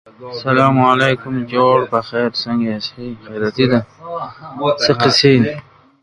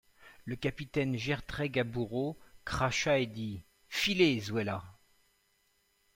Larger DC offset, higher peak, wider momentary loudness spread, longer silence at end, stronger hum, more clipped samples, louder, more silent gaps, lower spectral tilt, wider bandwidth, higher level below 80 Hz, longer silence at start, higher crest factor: neither; first, 0 dBFS vs -14 dBFS; about the same, 16 LU vs 14 LU; second, 0.4 s vs 1.25 s; neither; neither; first, -15 LUFS vs -33 LUFS; neither; about the same, -5.5 dB/octave vs -5 dB/octave; second, 11 kHz vs 16.5 kHz; first, -50 dBFS vs -56 dBFS; about the same, 0.2 s vs 0.2 s; about the same, 16 dB vs 20 dB